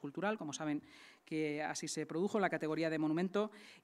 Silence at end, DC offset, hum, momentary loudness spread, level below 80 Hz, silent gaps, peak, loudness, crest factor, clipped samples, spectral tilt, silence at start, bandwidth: 0.05 s; under 0.1%; none; 8 LU; -86 dBFS; none; -20 dBFS; -38 LUFS; 18 dB; under 0.1%; -5 dB/octave; 0 s; 13 kHz